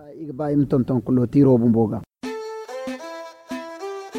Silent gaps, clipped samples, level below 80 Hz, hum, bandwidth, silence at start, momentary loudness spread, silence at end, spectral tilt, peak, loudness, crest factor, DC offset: none; under 0.1%; -52 dBFS; none; 11 kHz; 0 s; 18 LU; 0 s; -8.5 dB/octave; -6 dBFS; -21 LUFS; 16 dB; under 0.1%